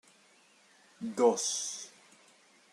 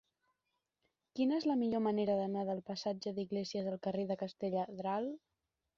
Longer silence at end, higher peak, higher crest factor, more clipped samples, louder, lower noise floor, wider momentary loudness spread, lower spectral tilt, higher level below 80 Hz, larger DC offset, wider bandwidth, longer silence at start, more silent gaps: first, 0.85 s vs 0.6 s; first, -14 dBFS vs -22 dBFS; first, 22 dB vs 16 dB; neither; first, -31 LUFS vs -37 LUFS; second, -64 dBFS vs -87 dBFS; first, 16 LU vs 6 LU; second, -2 dB/octave vs -6 dB/octave; second, -88 dBFS vs -78 dBFS; neither; first, 13 kHz vs 7.4 kHz; second, 1 s vs 1.15 s; neither